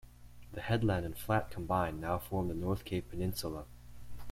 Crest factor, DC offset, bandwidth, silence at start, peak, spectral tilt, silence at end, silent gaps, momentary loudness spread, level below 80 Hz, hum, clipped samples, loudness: 20 dB; under 0.1%; 16.5 kHz; 0.05 s; -16 dBFS; -6.5 dB/octave; 0 s; none; 17 LU; -50 dBFS; 60 Hz at -50 dBFS; under 0.1%; -36 LUFS